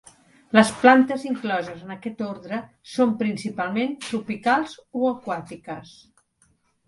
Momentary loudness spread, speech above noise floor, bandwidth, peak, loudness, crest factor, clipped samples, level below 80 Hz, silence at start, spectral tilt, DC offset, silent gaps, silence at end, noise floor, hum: 18 LU; 42 dB; 11.5 kHz; 0 dBFS; -23 LUFS; 22 dB; under 0.1%; -64 dBFS; 0.55 s; -5 dB/octave; under 0.1%; none; 1.05 s; -65 dBFS; none